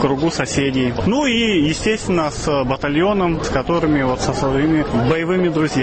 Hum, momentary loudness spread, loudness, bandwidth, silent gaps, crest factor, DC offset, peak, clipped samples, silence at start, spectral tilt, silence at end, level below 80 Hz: none; 3 LU; -18 LUFS; 8.8 kHz; none; 14 dB; 0.2%; -2 dBFS; under 0.1%; 0 s; -5.5 dB/octave; 0 s; -34 dBFS